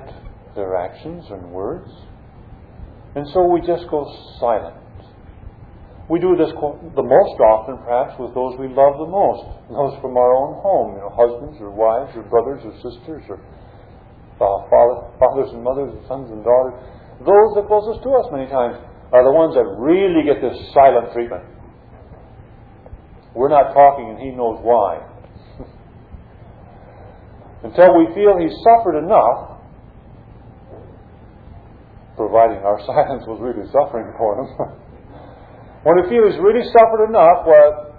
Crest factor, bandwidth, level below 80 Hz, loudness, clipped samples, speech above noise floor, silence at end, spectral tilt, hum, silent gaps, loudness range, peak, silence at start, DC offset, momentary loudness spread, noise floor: 16 dB; 4.9 kHz; -44 dBFS; -16 LUFS; under 0.1%; 27 dB; 0.05 s; -10.5 dB/octave; none; none; 7 LU; 0 dBFS; 0 s; under 0.1%; 18 LU; -42 dBFS